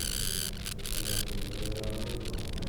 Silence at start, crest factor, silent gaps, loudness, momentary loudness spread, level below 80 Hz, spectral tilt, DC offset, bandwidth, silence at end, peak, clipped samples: 0 s; 20 dB; none; -34 LUFS; 6 LU; -38 dBFS; -3 dB/octave; under 0.1%; over 20 kHz; 0 s; -14 dBFS; under 0.1%